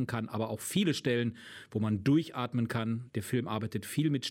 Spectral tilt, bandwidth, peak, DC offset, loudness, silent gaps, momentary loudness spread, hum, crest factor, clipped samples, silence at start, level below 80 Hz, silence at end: -5.5 dB/octave; 16.5 kHz; -16 dBFS; under 0.1%; -32 LUFS; none; 7 LU; none; 16 dB; under 0.1%; 0 s; -68 dBFS; 0 s